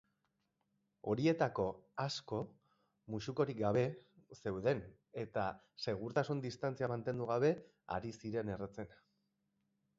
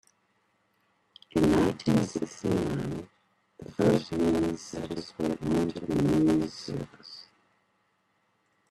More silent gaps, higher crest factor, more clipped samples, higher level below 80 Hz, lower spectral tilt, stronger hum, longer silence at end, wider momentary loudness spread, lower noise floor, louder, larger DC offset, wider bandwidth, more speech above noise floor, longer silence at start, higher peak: neither; about the same, 20 dB vs 20 dB; neither; second, -68 dBFS vs -54 dBFS; about the same, -5.5 dB/octave vs -6.5 dB/octave; neither; second, 1.05 s vs 1.5 s; second, 12 LU vs 16 LU; first, -84 dBFS vs -72 dBFS; second, -39 LUFS vs -28 LUFS; neither; second, 7.6 kHz vs 13.5 kHz; about the same, 45 dB vs 44 dB; second, 1.05 s vs 1.35 s; second, -20 dBFS vs -8 dBFS